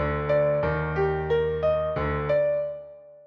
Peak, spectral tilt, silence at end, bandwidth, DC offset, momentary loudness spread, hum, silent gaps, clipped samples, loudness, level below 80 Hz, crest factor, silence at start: -12 dBFS; -9 dB/octave; 0.05 s; 5.8 kHz; under 0.1%; 5 LU; none; none; under 0.1%; -25 LUFS; -40 dBFS; 12 dB; 0 s